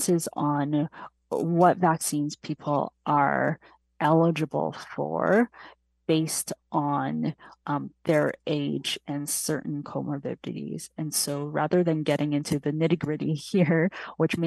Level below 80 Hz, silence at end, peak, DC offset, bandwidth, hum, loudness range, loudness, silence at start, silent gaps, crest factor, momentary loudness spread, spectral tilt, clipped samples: -66 dBFS; 0 s; -6 dBFS; under 0.1%; 12.5 kHz; none; 4 LU; -27 LUFS; 0 s; none; 20 dB; 11 LU; -5 dB/octave; under 0.1%